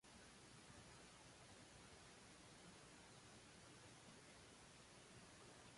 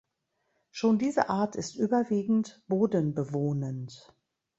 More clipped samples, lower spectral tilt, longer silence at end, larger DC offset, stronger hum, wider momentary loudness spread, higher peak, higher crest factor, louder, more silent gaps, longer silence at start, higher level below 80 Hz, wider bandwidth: neither; second, -3 dB/octave vs -7 dB/octave; second, 0 s vs 0.6 s; neither; neither; second, 1 LU vs 9 LU; second, -50 dBFS vs -8 dBFS; second, 14 dB vs 22 dB; second, -63 LUFS vs -29 LUFS; neither; second, 0.05 s vs 0.75 s; second, -78 dBFS vs -70 dBFS; first, 11.5 kHz vs 8 kHz